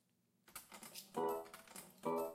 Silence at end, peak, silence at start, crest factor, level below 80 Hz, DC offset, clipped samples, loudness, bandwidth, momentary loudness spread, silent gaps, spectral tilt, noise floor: 0 s; -28 dBFS; 0.5 s; 18 dB; -84 dBFS; under 0.1%; under 0.1%; -47 LUFS; 16.5 kHz; 13 LU; none; -4 dB/octave; -74 dBFS